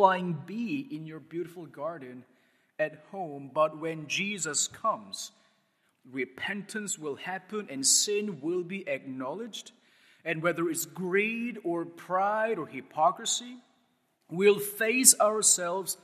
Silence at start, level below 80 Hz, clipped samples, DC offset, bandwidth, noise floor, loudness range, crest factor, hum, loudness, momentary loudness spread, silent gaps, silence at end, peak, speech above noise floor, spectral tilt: 0 s; -84 dBFS; under 0.1%; under 0.1%; 14.5 kHz; -72 dBFS; 9 LU; 28 dB; none; -28 LUFS; 17 LU; none; 0.1 s; -2 dBFS; 42 dB; -2 dB/octave